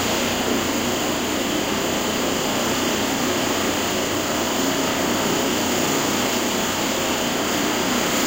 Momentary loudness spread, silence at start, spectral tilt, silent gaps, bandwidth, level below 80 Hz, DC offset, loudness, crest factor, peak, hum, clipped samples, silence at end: 2 LU; 0 s; -2.5 dB/octave; none; 16 kHz; -48 dBFS; under 0.1%; -21 LUFS; 14 dB; -8 dBFS; none; under 0.1%; 0 s